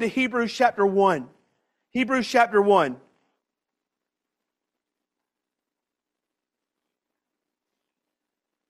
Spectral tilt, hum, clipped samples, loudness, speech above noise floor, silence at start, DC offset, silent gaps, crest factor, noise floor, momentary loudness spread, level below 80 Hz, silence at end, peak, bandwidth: -5 dB/octave; none; under 0.1%; -22 LUFS; 65 dB; 0 s; under 0.1%; none; 22 dB; -86 dBFS; 10 LU; -70 dBFS; 5.75 s; -6 dBFS; 13 kHz